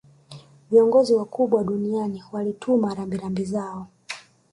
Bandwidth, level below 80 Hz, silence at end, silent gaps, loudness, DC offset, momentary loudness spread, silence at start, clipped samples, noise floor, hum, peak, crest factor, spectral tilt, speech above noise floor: 11 kHz; -60 dBFS; 0.35 s; none; -22 LUFS; under 0.1%; 19 LU; 0.3 s; under 0.1%; -46 dBFS; none; -6 dBFS; 18 dB; -7 dB/octave; 24 dB